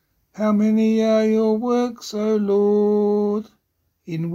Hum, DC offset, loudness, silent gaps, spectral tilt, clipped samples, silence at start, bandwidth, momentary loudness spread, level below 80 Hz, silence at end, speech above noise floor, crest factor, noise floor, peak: none; under 0.1%; -19 LUFS; none; -7.5 dB/octave; under 0.1%; 0.35 s; 7.6 kHz; 8 LU; -62 dBFS; 0 s; 51 dB; 12 dB; -70 dBFS; -8 dBFS